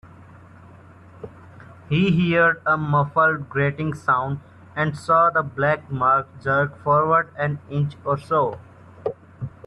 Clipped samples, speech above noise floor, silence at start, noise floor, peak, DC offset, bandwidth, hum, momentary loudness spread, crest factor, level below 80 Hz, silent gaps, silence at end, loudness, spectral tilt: under 0.1%; 25 dB; 0.05 s; -46 dBFS; -6 dBFS; under 0.1%; 10.5 kHz; none; 16 LU; 16 dB; -56 dBFS; none; 0.15 s; -21 LUFS; -8 dB/octave